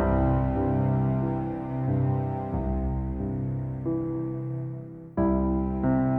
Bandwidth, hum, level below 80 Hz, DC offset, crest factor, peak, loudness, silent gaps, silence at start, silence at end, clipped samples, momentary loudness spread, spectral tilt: 3.2 kHz; none; -36 dBFS; under 0.1%; 14 dB; -12 dBFS; -28 LUFS; none; 0 s; 0 s; under 0.1%; 7 LU; -12.5 dB/octave